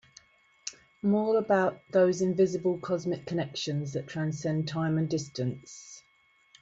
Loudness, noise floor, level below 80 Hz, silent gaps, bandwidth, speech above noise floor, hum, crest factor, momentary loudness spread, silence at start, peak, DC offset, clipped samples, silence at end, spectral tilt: -29 LUFS; -66 dBFS; -68 dBFS; none; 8 kHz; 37 dB; none; 18 dB; 16 LU; 0.65 s; -12 dBFS; under 0.1%; under 0.1%; 0.65 s; -6 dB/octave